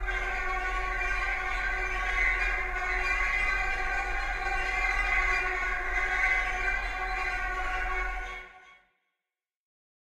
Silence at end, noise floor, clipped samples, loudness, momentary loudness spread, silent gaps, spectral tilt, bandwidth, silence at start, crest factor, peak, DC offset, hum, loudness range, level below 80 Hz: 1.25 s; under -90 dBFS; under 0.1%; -29 LUFS; 6 LU; none; -3 dB/octave; 12.5 kHz; 0 s; 16 dB; -14 dBFS; under 0.1%; none; 4 LU; -36 dBFS